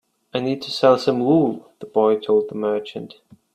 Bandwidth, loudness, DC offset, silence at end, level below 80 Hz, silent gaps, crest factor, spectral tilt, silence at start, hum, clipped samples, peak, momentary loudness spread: 10 kHz; -20 LUFS; under 0.1%; 0.45 s; -66 dBFS; none; 20 dB; -6.5 dB/octave; 0.35 s; none; under 0.1%; 0 dBFS; 17 LU